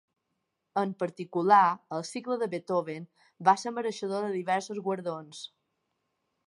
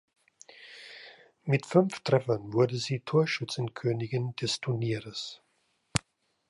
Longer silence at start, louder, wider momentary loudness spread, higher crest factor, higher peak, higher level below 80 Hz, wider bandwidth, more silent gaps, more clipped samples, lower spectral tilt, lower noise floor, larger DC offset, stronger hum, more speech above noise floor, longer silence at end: first, 0.75 s vs 0.6 s; about the same, -29 LUFS vs -30 LUFS; second, 17 LU vs 20 LU; second, 22 dB vs 28 dB; second, -8 dBFS vs -4 dBFS; second, -84 dBFS vs -62 dBFS; about the same, 11.5 kHz vs 11.5 kHz; neither; neither; about the same, -5 dB/octave vs -5.5 dB/octave; first, -81 dBFS vs -73 dBFS; neither; neither; first, 52 dB vs 45 dB; first, 1 s vs 0.5 s